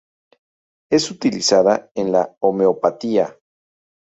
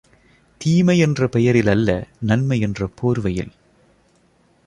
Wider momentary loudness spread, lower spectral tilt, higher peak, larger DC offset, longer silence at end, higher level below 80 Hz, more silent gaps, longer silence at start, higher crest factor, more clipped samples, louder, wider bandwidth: second, 6 LU vs 9 LU; second, -4 dB/octave vs -7 dB/octave; about the same, -2 dBFS vs -2 dBFS; neither; second, 0.8 s vs 1.2 s; second, -62 dBFS vs -44 dBFS; first, 1.91-1.95 s, 2.37-2.41 s vs none; first, 0.9 s vs 0.6 s; about the same, 18 dB vs 16 dB; neither; about the same, -18 LUFS vs -19 LUFS; second, 8.4 kHz vs 11.5 kHz